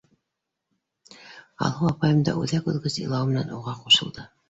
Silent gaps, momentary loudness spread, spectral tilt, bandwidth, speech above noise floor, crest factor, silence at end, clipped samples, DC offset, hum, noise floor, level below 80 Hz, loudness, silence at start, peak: none; 11 LU; -5 dB/octave; 8 kHz; 59 dB; 20 dB; 0.25 s; under 0.1%; under 0.1%; none; -83 dBFS; -58 dBFS; -23 LUFS; 1.2 s; -6 dBFS